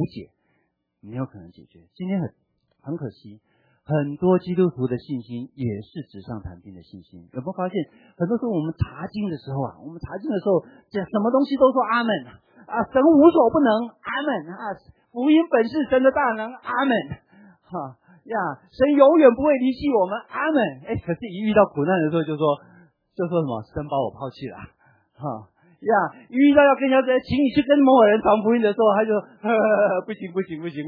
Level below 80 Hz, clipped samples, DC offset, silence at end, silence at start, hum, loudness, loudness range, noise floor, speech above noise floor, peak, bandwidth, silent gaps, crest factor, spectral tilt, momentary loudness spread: -52 dBFS; under 0.1%; under 0.1%; 0 s; 0 s; none; -21 LUFS; 11 LU; -71 dBFS; 50 dB; -2 dBFS; 5 kHz; none; 20 dB; -10 dB/octave; 19 LU